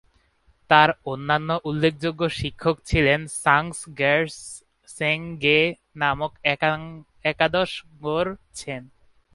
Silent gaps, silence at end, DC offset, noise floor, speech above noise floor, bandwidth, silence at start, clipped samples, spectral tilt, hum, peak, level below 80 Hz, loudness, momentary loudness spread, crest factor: none; 0.5 s; under 0.1%; -62 dBFS; 39 dB; 11.5 kHz; 0.7 s; under 0.1%; -4.5 dB/octave; none; 0 dBFS; -44 dBFS; -22 LUFS; 15 LU; 24 dB